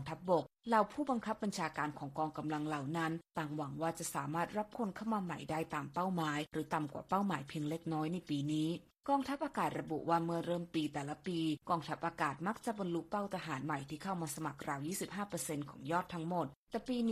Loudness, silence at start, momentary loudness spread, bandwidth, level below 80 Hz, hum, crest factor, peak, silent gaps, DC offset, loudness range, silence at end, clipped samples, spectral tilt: -39 LUFS; 0 s; 6 LU; 14.5 kHz; -70 dBFS; none; 20 dB; -18 dBFS; 16.56-16.67 s; under 0.1%; 3 LU; 0 s; under 0.1%; -5.5 dB/octave